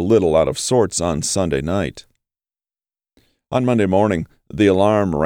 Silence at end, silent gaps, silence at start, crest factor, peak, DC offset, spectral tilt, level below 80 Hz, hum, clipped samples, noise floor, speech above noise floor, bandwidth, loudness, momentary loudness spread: 0 s; none; 0 s; 14 dB; -4 dBFS; under 0.1%; -5.5 dB/octave; -42 dBFS; none; under 0.1%; under -90 dBFS; over 73 dB; 17 kHz; -18 LUFS; 9 LU